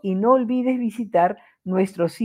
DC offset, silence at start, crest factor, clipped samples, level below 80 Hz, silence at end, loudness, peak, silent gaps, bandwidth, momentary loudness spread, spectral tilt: under 0.1%; 0.05 s; 16 dB; under 0.1%; -70 dBFS; 0 s; -21 LUFS; -4 dBFS; none; 12.5 kHz; 7 LU; -8 dB/octave